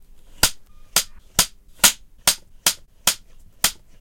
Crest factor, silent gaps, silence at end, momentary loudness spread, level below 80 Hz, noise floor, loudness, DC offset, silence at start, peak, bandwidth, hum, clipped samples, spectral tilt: 24 dB; none; 0.25 s; 6 LU; -42 dBFS; -44 dBFS; -20 LUFS; under 0.1%; 0.45 s; 0 dBFS; 17 kHz; none; under 0.1%; 0.5 dB/octave